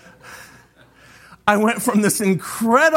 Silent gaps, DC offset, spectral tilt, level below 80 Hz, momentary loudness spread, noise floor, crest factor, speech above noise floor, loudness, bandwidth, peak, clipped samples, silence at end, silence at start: none; under 0.1%; -4.5 dB/octave; -58 dBFS; 23 LU; -50 dBFS; 18 dB; 33 dB; -18 LUFS; 16.5 kHz; -2 dBFS; under 0.1%; 0 s; 0.25 s